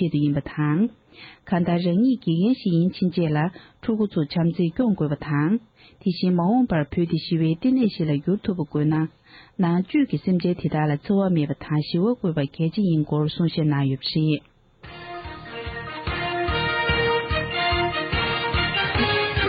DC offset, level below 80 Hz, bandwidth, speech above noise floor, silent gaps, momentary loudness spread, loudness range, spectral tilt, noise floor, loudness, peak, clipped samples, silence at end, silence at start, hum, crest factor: under 0.1%; -42 dBFS; 5.2 kHz; 22 dB; none; 8 LU; 3 LU; -10.5 dB/octave; -44 dBFS; -23 LUFS; -8 dBFS; under 0.1%; 0 s; 0 s; none; 14 dB